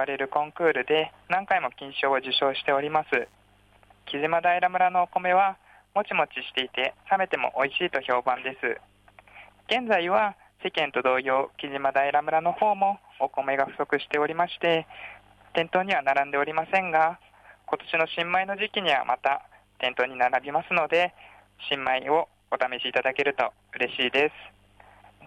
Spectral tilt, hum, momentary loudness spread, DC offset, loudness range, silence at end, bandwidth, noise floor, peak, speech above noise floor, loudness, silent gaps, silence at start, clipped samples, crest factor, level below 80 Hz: -5 dB/octave; 50 Hz at -65 dBFS; 7 LU; under 0.1%; 2 LU; 0 s; 9.6 kHz; -59 dBFS; -10 dBFS; 33 dB; -26 LUFS; none; 0 s; under 0.1%; 16 dB; -68 dBFS